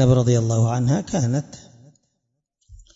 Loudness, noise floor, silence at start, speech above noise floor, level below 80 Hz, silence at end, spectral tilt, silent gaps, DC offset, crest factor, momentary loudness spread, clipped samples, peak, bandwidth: -20 LUFS; -76 dBFS; 0 s; 57 dB; -46 dBFS; 0.2 s; -7 dB/octave; none; under 0.1%; 18 dB; 8 LU; under 0.1%; -4 dBFS; 7.8 kHz